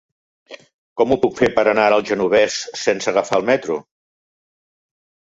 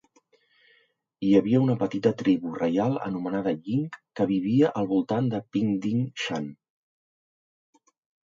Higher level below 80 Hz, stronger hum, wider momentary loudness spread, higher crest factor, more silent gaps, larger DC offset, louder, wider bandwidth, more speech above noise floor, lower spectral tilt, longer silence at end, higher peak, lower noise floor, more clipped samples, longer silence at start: first, -54 dBFS vs -66 dBFS; neither; about the same, 6 LU vs 8 LU; about the same, 18 dB vs 20 dB; first, 0.74-0.96 s vs none; neither; first, -18 LUFS vs -26 LUFS; about the same, 8 kHz vs 7.6 kHz; first, over 73 dB vs 41 dB; second, -4 dB/octave vs -7.5 dB/octave; second, 1.45 s vs 1.75 s; first, -2 dBFS vs -8 dBFS; first, under -90 dBFS vs -66 dBFS; neither; second, 0.5 s vs 1.2 s